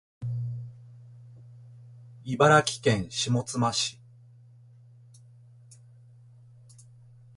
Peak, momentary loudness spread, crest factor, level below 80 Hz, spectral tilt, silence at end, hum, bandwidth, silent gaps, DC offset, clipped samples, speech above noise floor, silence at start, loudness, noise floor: -8 dBFS; 30 LU; 24 dB; -60 dBFS; -4.5 dB/octave; 3.45 s; 60 Hz at -50 dBFS; 11.5 kHz; none; under 0.1%; under 0.1%; 29 dB; 0.2 s; -26 LUFS; -53 dBFS